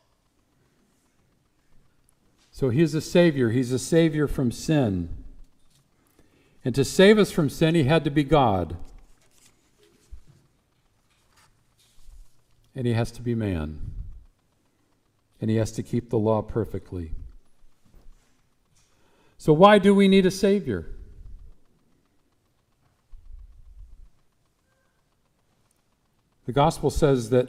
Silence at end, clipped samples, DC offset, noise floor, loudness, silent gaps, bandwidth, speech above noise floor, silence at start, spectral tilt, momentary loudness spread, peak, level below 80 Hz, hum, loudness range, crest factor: 0 s; under 0.1%; under 0.1%; -68 dBFS; -22 LUFS; none; 16 kHz; 47 dB; 2.55 s; -6.5 dB/octave; 20 LU; -4 dBFS; -44 dBFS; none; 11 LU; 22 dB